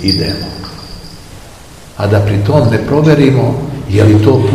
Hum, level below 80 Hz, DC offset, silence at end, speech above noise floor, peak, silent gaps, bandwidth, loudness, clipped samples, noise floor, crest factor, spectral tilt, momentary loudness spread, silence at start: none; -34 dBFS; 0.8%; 0 s; 25 dB; 0 dBFS; none; 13 kHz; -11 LUFS; 1%; -34 dBFS; 12 dB; -7.5 dB/octave; 21 LU; 0 s